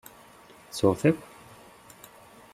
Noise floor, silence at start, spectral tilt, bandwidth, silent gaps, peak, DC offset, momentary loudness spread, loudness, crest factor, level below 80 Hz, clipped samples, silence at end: -52 dBFS; 0.75 s; -6.5 dB/octave; 15.5 kHz; none; -8 dBFS; under 0.1%; 26 LU; -26 LUFS; 24 dB; -64 dBFS; under 0.1%; 1.35 s